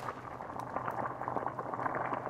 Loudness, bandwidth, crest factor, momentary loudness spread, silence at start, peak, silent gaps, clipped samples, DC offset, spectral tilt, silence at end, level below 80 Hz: -38 LUFS; 16 kHz; 20 dB; 7 LU; 0 s; -18 dBFS; none; under 0.1%; under 0.1%; -7 dB/octave; 0 s; -66 dBFS